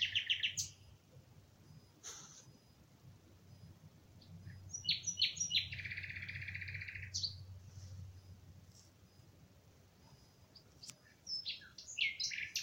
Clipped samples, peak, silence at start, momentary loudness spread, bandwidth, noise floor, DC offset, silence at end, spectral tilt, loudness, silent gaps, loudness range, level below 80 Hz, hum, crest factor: under 0.1%; -20 dBFS; 0 s; 27 LU; 16 kHz; -65 dBFS; under 0.1%; 0 s; 0 dB/octave; -39 LUFS; none; 19 LU; -70 dBFS; none; 24 dB